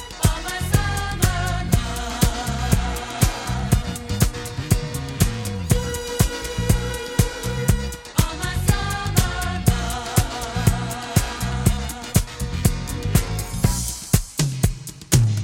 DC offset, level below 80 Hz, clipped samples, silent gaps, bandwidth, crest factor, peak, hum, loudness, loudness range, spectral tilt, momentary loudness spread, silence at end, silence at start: under 0.1%; -28 dBFS; under 0.1%; none; 17 kHz; 20 dB; 0 dBFS; none; -23 LUFS; 1 LU; -4.5 dB/octave; 5 LU; 0 s; 0 s